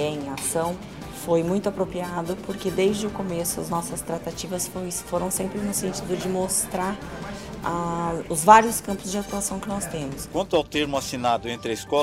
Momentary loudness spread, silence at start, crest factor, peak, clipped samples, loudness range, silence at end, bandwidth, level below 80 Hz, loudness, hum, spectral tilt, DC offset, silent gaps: 8 LU; 0 s; 24 dB; 0 dBFS; under 0.1%; 5 LU; 0 s; 16 kHz; -48 dBFS; -25 LUFS; none; -4 dB/octave; 0.1%; none